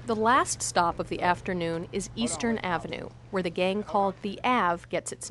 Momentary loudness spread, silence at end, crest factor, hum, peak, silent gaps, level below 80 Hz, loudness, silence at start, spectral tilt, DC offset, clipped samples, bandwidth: 9 LU; 0 s; 20 dB; none; -8 dBFS; none; -52 dBFS; -28 LUFS; 0 s; -4 dB/octave; under 0.1%; under 0.1%; 12 kHz